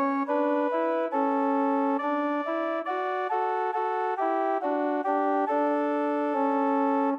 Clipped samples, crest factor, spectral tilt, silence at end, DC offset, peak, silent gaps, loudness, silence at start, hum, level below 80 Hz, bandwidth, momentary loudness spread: under 0.1%; 12 dB; -5.5 dB/octave; 0 s; under 0.1%; -14 dBFS; none; -27 LUFS; 0 s; none; -88 dBFS; 5.6 kHz; 3 LU